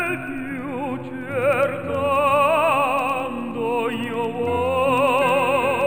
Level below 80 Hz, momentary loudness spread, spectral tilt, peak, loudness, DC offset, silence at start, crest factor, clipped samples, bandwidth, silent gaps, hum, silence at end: -52 dBFS; 11 LU; -5.5 dB/octave; -8 dBFS; -21 LUFS; 0.5%; 0 s; 14 dB; under 0.1%; over 20 kHz; none; none; 0 s